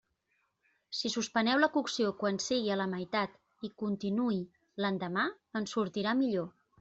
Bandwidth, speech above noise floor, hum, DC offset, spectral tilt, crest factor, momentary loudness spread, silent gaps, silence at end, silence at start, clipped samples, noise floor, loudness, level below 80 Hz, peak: 8.2 kHz; 46 dB; none; under 0.1%; -4.5 dB/octave; 20 dB; 10 LU; none; 0.3 s; 0.9 s; under 0.1%; -78 dBFS; -33 LUFS; -74 dBFS; -12 dBFS